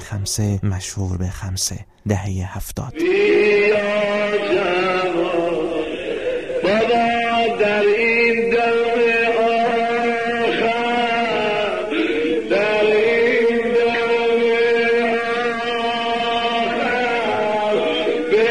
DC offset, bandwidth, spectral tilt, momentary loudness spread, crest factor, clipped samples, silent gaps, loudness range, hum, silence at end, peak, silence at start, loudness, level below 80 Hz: 0.5%; 14.5 kHz; -4.5 dB/octave; 8 LU; 14 dB; under 0.1%; none; 3 LU; none; 0 s; -4 dBFS; 0 s; -18 LUFS; -46 dBFS